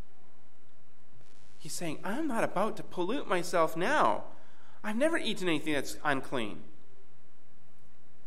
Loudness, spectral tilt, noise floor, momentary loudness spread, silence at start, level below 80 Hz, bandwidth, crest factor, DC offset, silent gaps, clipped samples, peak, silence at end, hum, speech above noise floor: -32 LUFS; -4 dB/octave; -66 dBFS; 13 LU; 1.6 s; -70 dBFS; 16 kHz; 22 dB; 3%; none; under 0.1%; -14 dBFS; 1.6 s; none; 34 dB